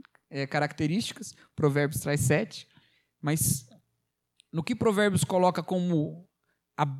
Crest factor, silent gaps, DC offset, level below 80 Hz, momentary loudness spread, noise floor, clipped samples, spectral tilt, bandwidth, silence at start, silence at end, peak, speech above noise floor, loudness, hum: 18 dB; none; under 0.1%; -58 dBFS; 14 LU; -80 dBFS; under 0.1%; -5 dB/octave; 16 kHz; 0.3 s; 0 s; -10 dBFS; 52 dB; -28 LUFS; none